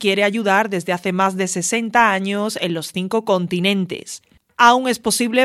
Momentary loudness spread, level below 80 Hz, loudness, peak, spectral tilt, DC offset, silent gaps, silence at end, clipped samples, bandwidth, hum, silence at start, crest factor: 10 LU; -60 dBFS; -18 LUFS; 0 dBFS; -3.5 dB/octave; under 0.1%; none; 0 s; under 0.1%; 15 kHz; none; 0 s; 18 dB